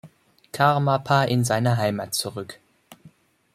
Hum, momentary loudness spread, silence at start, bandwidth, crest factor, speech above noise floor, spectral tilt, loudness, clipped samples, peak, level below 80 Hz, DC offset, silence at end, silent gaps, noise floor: none; 16 LU; 0.05 s; 15.5 kHz; 20 dB; 32 dB; -5 dB/octave; -22 LUFS; under 0.1%; -4 dBFS; -62 dBFS; under 0.1%; 0.45 s; none; -54 dBFS